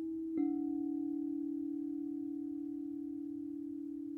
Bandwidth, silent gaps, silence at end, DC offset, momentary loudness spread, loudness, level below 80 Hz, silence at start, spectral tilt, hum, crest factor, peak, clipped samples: 2.2 kHz; none; 0 s; under 0.1%; 7 LU; -40 LUFS; -76 dBFS; 0 s; -9.5 dB/octave; none; 14 dB; -26 dBFS; under 0.1%